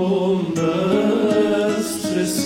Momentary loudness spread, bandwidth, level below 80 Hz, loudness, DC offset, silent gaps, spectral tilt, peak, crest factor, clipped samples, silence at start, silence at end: 4 LU; 17 kHz; -54 dBFS; -19 LUFS; under 0.1%; none; -5.5 dB/octave; -8 dBFS; 12 dB; under 0.1%; 0 s; 0 s